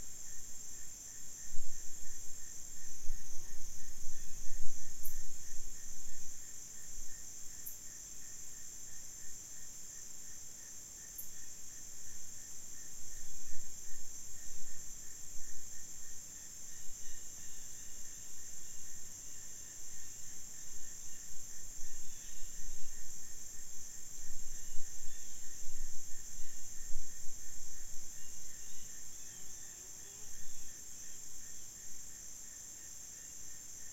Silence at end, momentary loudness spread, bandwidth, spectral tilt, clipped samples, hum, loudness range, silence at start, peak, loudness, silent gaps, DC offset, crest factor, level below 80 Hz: 0 s; 1 LU; 16 kHz; -1.5 dB/octave; under 0.1%; none; 1 LU; 0 s; -14 dBFS; -47 LUFS; none; under 0.1%; 18 dB; -48 dBFS